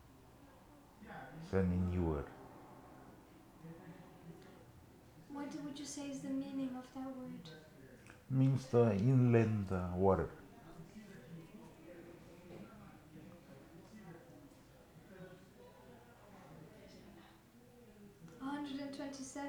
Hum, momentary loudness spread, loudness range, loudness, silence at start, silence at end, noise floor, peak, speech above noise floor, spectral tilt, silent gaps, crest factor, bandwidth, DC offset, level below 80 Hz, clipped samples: none; 27 LU; 23 LU; -37 LUFS; 0.4 s; 0 s; -62 dBFS; -18 dBFS; 27 dB; -7.5 dB/octave; none; 22 dB; 18 kHz; under 0.1%; -62 dBFS; under 0.1%